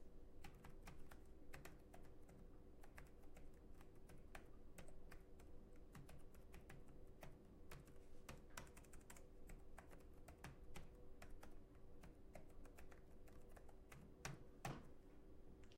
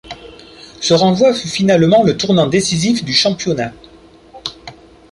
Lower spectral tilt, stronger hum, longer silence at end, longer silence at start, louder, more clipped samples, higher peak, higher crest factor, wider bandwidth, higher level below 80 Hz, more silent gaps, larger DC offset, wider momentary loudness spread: about the same, -5 dB/octave vs -4.5 dB/octave; neither; second, 0 s vs 0.4 s; about the same, 0 s vs 0.05 s; second, -64 LUFS vs -13 LUFS; neither; second, -34 dBFS vs -2 dBFS; first, 24 dB vs 14 dB; first, 16 kHz vs 11.5 kHz; second, -62 dBFS vs -48 dBFS; neither; neither; second, 8 LU vs 17 LU